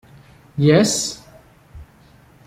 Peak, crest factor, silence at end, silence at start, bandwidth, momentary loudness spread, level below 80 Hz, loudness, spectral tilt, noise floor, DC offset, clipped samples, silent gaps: -2 dBFS; 20 dB; 0.65 s; 0.55 s; 15.5 kHz; 19 LU; -50 dBFS; -17 LUFS; -5 dB/octave; -50 dBFS; under 0.1%; under 0.1%; none